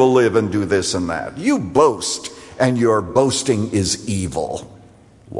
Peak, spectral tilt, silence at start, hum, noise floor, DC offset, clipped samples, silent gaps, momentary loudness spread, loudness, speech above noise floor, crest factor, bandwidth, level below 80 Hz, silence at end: -2 dBFS; -4.5 dB/octave; 0 s; none; -46 dBFS; under 0.1%; under 0.1%; none; 9 LU; -18 LUFS; 29 dB; 16 dB; 11.5 kHz; -50 dBFS; 0 s